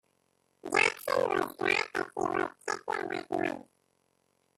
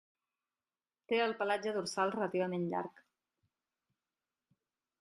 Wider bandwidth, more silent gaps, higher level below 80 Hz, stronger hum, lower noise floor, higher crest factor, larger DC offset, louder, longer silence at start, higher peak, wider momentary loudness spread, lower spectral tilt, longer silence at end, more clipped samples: first, 15 kHz vs 12.5 kHz; neither; first, -72 dBFS vs -84 dBFS; neither; second, -74 dBFS vs under -90 dBFS; about the same, 20 dB vs 20 dB; neither; first, -31 LUFS vs -35 LUFS; second, 0.65 s vs 1.1 s; first, -12 dBFS vs -18 dBFS; first, 9 LU vs 5 LU; second, -3 dB/octave vs -5 dB/octave; second, 0.95 s vs 2.1 s; neither